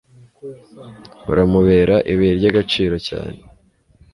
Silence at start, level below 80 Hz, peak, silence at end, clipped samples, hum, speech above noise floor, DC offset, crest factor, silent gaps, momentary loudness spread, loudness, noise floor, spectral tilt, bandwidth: 0.45 s; -36 dBFS; -2 dBFS; 0.8 s; under 0.1%; none; 36 dB; under 0.1%; 16 dB; none; 23 LU; -16 LUFS; -53 dBFS; -7.5 dB/octave; 11.5 kHz